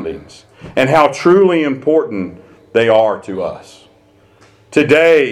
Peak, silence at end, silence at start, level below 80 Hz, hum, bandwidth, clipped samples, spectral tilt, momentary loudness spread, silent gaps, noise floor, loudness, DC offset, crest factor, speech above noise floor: 0 dBFS; 0 s; 0 s; -52 dBFS; none; 12.5 kHz; under 0.1%; -6 dB/octave; 15 LU; none; -49 dBFS; -13 LUFS; under 0.1%; 14 dB; 36 dB